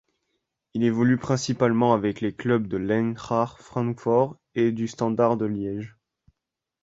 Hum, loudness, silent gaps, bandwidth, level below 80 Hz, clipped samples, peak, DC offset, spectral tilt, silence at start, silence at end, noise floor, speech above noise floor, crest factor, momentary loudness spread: none; -24 LUFS; none; 8 kHz; -58 dBFS; under 0.1%; -6 dBFS; under 0.1%; -7 dB/octave; 0.75 s; 0.95 s; -86 dBFS; 62 dB; 20 dB; 8 LU